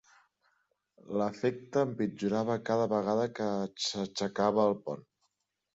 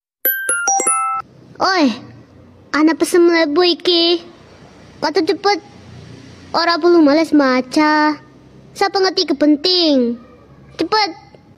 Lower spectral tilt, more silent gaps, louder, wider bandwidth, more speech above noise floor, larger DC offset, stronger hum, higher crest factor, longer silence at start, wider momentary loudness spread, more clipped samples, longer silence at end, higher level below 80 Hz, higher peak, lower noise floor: first, -5.5 dB/octave vs -2 dB/octave; neither; second, -32 LUFS vs -15 LUFS; second, 8 kHz vs 15 kHz; first, 49 dB vs 30 dB; neither; neither; first, 18 dB vs 12 dB; first, 1.05 s vs 0.25 s; second, 5 LU vs 9 LU; neither; first, 0.75 s vs 0.4 s; second, -72 dBFS vs -58 dBFS; second, -14 dBFS vs -4 dBFS; first, -80 dBFS vs -44 dBFS